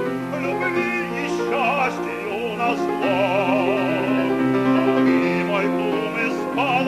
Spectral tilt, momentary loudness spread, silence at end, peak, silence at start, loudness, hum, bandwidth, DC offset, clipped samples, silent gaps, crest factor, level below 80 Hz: -6 dB/octave; 6 LU; 0 s; -6 dBFS; 0 s; -21 LUFS; none; 14 kHz; under 0.1%; under 0.1%; none; 14 dB; -56 dBFS